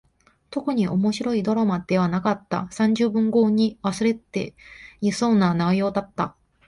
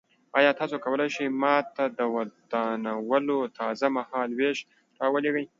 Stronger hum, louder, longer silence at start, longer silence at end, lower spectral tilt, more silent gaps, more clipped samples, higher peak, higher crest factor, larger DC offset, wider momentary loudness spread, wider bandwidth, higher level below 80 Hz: neither; first, -23 LUFS vs -27 LUFS; first, 0.5 s vs 0.35 s; first, 0.4 s vs 0.15 s; first, -6.5 dB/octave vs -5 dB/octave; neither; neither; about the same, -8 dBFS vs -6 dBFS; about the same, 16 dB vs 20 dB; neither; first, 10 LU vs 7 LU; first, 11.5 kHz vs 7.6 kHz; first, -56 dBFS vs -78 dBFS